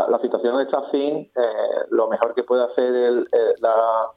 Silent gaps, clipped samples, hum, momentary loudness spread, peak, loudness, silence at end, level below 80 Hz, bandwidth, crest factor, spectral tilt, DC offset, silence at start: none; under 0.1%; none; 4 LU; -2 dBFS; -20 LUFS; 0.05 s; -72 dBFS; 4.9 kHz; 18 dB; -7.5 dB/octave; under 0.1%; 0 s